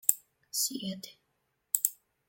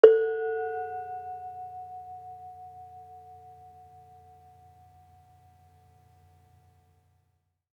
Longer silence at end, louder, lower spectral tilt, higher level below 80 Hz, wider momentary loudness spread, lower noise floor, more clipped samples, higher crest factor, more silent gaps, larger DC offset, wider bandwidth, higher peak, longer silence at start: second, 0.35 s vs 4.6 s; about the same, -32 LUFS vs -30 LUFS; second, -1.5 dB/octave vs -6 dB/octave; about the same, -82 dBFS vs -78 dBFS; second, 13 LU vs 23 LU; about the same, -78 dBFS vs -75 dBFS; neither; about the same, 32 dB vs 30 dB; neither; neither; first, 17 kHz vs 5 kHz; about the same, -2 dBFS vs -2 dBFS; about the same, 0.1 s vs 0.05 s